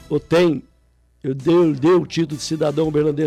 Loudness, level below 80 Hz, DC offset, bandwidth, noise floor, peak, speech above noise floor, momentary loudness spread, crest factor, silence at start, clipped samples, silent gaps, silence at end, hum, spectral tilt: -18 LUFS; -50 dBFS; under 0.1%; 12.5 kHz; -57 dBFS; -10 dBFS; 40 dB; 10 LU; 10 dB; 0.1 s; under 0.1%; none; 0 s; none; -6.5 dB/octave